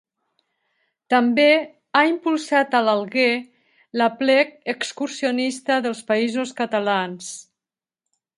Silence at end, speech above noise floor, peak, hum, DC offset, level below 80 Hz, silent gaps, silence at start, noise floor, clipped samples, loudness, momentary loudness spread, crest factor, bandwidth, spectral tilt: 0.95 s; over 70 dB; -2 dBFS; none; under 0.1%; -74 dBFS; none; 1.1 s; under -90 dBFS; under 0.1%; -20 LUFS; 10 LU; 20 dB; 11.5 kHz; -3.5 dB/octave